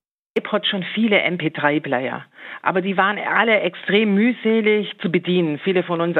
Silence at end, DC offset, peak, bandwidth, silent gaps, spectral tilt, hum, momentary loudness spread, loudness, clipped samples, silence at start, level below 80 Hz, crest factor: 0 s; under 0.1%; -2 dBFS; 4.4 kHz; none; -8 dB/octave; none; 7 LU; -19 LUFS; under 0.1%; 0.35 s; -76 dBFS; 18 dB